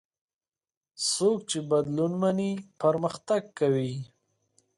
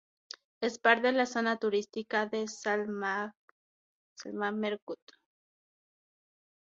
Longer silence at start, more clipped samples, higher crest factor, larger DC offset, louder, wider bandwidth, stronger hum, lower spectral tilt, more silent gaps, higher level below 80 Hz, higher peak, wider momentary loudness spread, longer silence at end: first, 1 s vs 0.6 s; neither; second, 16 dB vs 26 dB; neither; first, -27 LUFS vs -31 LUFS; first, 11.5 kHz vs 7.8 kHz; neither; about the same, -5 dB/octave vs -4 dB/octave; second, none vs 3.37-4.16 s, 4.82-4.87 s; first, -70 dBFS vs -82 dBFS; second, -12 dBFS vs -8 dBFS; second, 6 LU vs 19 LU; second, 0.7 s vs 1.7 s